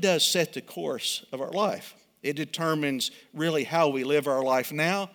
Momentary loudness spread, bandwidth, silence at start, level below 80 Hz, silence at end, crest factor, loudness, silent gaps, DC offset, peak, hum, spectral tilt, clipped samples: 10 LU; over 20 kHz; 0 s; -82 dBFS; 0.05 s; 18 dB; -27 LUFS; none; under 0.1%; -10 dBFS; none; -3.5 dB/octave; under 0.1%